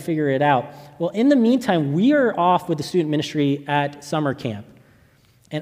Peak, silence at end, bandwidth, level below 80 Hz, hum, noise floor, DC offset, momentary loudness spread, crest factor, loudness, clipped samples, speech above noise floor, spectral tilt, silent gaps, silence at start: -4 dBFS; 0 s; 15 kHz; -64 dBFS; none; -55 dBFS; under 0.1%; 11 LU; 16 dB; -20 LUFS; under 0.1%; 36 dB; -6.5 dB/octave; none; 0 s